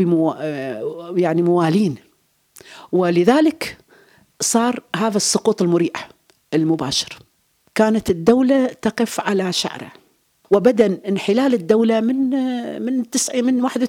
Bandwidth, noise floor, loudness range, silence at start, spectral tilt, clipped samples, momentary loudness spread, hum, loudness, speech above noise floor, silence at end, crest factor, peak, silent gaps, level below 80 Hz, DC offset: 17 kHz; -61 dBFS; 2 LU; 0 s; -4.5 dB/octave; under 0.1%; 11 LU; none; -18 LUFS; 43 dB; 0 s; 18 dB; -2 dBFS; none; -56 dBFS; under 0.1%